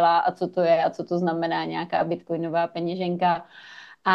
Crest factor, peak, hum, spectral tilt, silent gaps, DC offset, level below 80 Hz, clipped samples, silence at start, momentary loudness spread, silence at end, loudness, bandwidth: 18 dB; -6 dBFS; none; -7.5 dB/octave; none; under 0.1%; -70 dBFS; under 0.1%; 0 s; 8 LU; 0 s; -25 LUFS; 7 kHz